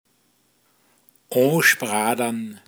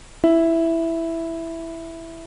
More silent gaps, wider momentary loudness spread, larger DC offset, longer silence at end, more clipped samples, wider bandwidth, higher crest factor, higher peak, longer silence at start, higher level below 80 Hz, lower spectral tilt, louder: neither; second, 10 LU vs 16 LU; neither; about the same, 0.1 s vs 0 s; neither; first, over 20 kHz vs 10.5 kHz; about the same, 20 dB vs 16 dB; about the same, -4 dBFS vs -6 dBFS; first, 1.3 s vs 0 s; second, -78 dBFS vs -46 dBFS; second, -3.5 dB/octave vs -6 dB/octave; about the same, -20 LUFS vs -21 LUFS